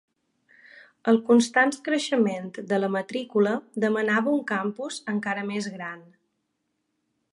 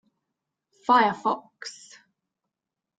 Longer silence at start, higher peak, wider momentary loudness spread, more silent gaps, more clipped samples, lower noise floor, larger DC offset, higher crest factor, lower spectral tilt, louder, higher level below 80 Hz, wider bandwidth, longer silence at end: first, 1.05 s vs 0.9 s; about the same, -8 dBFS vs -6 dBFS; second, 13 LU vs 20 LU; neither; neither; second, -77 dBFS vs -86 dBFS; neither; about the same, 18 dB vs 22 dB; about the same, -5 dB/octave vs -4 dB/octave; about the same, -25 LUFS vs -23 LUFS; about the same, -76 dBFS vs -74 dBFS; first, 11.5 kHz vs 9.2 kHz; about the same, 1.3 s vs 1.25 s